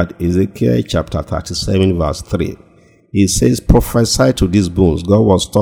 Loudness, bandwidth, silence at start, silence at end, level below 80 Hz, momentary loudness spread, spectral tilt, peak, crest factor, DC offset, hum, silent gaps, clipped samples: -14 LUFS; over 20 kHz; 0 s; 0 s; -26 dBFS; 9 LU; -6 dB/octave; 0 dBFS; 14 dB; under 0.1%; none; none; 0.2%